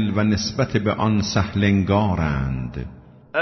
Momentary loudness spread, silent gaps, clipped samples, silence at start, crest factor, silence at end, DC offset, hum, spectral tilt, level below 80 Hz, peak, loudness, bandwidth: 10 LU; none; under 0.1%; 0 s; 14 dB; 0 s; under 0.1%; none; -6 dB/octave; -38 dBFS; -6 dBFS; -21 LUFS; 6.4 kHz